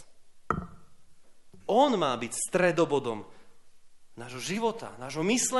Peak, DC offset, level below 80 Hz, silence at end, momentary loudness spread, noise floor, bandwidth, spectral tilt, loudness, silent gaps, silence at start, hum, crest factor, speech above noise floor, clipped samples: -10 dBFS; under 0.1%; -58 dBFS; 0 s; 17 LU; -50 dBFS; 11.5 kHz; -3.5 dB/octave; -29 LUFS; none; 0 s; none; 20 dB; 22 dB; under 0.1%